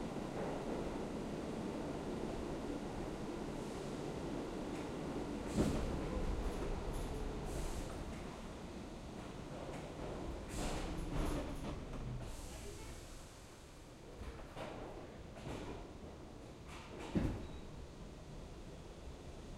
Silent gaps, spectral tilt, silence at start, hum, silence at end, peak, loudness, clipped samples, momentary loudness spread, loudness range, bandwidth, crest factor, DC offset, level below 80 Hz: none; -6 dB/octave; 0 s; none; 0 s; -24 dBFS; -45 LUFS; under 0.1%; 12 LU; 9 LU; 16 kHz; 20 dB; under 0.1%; -50 dBFS